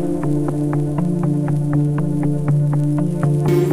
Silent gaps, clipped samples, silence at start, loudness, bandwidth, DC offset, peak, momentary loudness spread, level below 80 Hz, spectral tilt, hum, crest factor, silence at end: none; under 0.1%; 0 s; -19 LUFS; 15.5 kHz; 2%; -6 dBFS; 3 LU; -42 dBFS; -9.5 dB/octave; none; 12 dB; 0 s